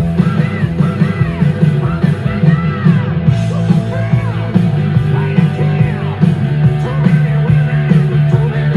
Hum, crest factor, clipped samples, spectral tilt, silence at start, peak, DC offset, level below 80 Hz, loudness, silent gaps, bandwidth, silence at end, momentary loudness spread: none; 12 dB; 0.3%; -9 dB/octave; 0 s; 0 dBFS; under 0.1%; -34 dBFS; -13 LUFS; none; 6.6 kHz; 0 s; 3 LU